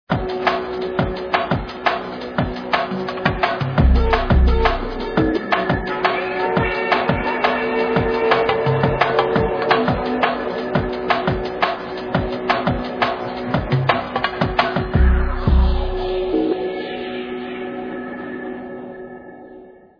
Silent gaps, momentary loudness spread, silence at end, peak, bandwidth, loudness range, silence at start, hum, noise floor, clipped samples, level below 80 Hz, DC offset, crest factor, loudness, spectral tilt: none; 11 LU; 0.25 s; 0 dBFS; 5.4 kHz; 4 LU; 0.1 s; none; -42 dBFS; under 0.1%; -26 dBFS; under 0.1%; 18 dB; -20 LUFS; -8 dB/octave